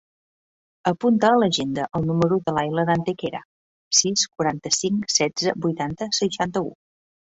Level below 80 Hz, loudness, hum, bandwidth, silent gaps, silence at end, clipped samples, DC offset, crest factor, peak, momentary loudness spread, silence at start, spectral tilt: -58 dBFS; -22 LUFS; none; 8.2 kHz; 3.45-3.91 s; 0.65 s; under 0.1%; under 0.1%; 20 dB; -2 dBFS; 10 LU; 0.85 s; -3.5 dB/octave